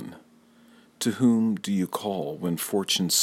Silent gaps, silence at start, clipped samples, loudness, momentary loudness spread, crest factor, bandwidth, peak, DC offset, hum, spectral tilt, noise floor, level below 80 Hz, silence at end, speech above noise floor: none; 0 s; under 0.1%; -26 LUFS; 8 LU; 18 dB; 16.5 kHz; -10 dBFS; under 0.1%; none; -4 dB/octave; -56 dBFS; -70 dBFS; 0 s; 31 dB